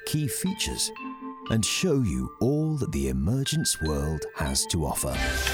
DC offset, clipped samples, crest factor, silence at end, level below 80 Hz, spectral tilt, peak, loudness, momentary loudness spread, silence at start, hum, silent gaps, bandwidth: under 0.1%; under 0.1%; 16 dB; 0 s; -38 dBFS; -4 dB/octave; -10 dBFS; -27 LUFS; 5 LU; 0 s; none; none; over 20 kHz